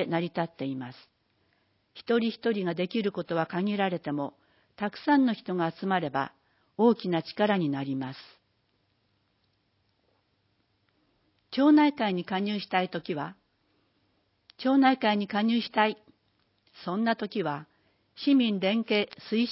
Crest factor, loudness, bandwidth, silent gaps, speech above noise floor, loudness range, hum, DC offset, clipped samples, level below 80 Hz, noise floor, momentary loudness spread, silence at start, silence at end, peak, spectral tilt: 20 dB; -28 LUFS; 5.8 kHz; none; 46 dB; 4 LU; none; under 0.1%; under 0.1%; -76 dBFS; -73 dBFS; 12 LU; 0 s; 0 s; -8 dBFS; -10 dB/octave